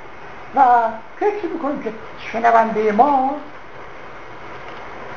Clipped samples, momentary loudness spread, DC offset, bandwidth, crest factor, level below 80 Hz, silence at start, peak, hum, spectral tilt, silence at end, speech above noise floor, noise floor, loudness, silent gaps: under 0.1%; 22 LU; 2%; 7 kHz; 20 dB; -54 dBFS; 0 s; 0 dBFS; none; -6.5 dB/octave; 0 s; 20 dB; -37 dBFS; -18 LUFS; none